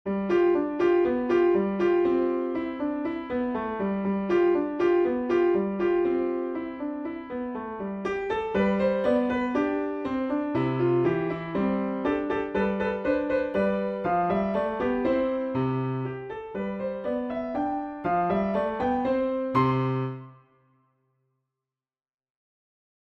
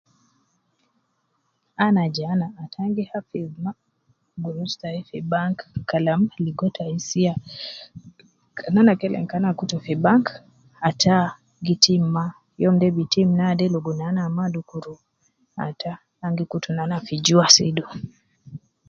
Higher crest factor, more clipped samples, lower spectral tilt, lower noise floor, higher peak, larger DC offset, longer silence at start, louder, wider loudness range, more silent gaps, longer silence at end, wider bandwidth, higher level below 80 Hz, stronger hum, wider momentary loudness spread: second, 16 dB vs 22 dB; neither; first, -9 dB/octave vs -4.5 dB/octave; first, under -90 dBFS vs -71 dBFS; second, -10 dBFS vs 0 dBFS; neither; second, 0.05 s vs 1.8 s; second, -26 LUFS vs -22 LUFS; second, 4 LU vs 8 LU; neither; first, 2.7 s vs 0.3 s; second, 6.2 kHz vs 7.6 kHz; first, -54 dBFS vs -60 dBFS; neither; second, 9 LU vs 17 LU